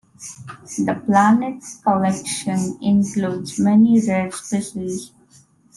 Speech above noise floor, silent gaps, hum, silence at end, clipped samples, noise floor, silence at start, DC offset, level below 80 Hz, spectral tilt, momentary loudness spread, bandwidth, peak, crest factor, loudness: 34 dB; none; none; 0.7 s; under 0.1%; -53 dBFS; 0.2 s; under 0.1%; -60 dBFS; -5.5 dB/octave; 16 LU; 12.5 kHz; -4 dBFS; 16 dB; -19 LUFS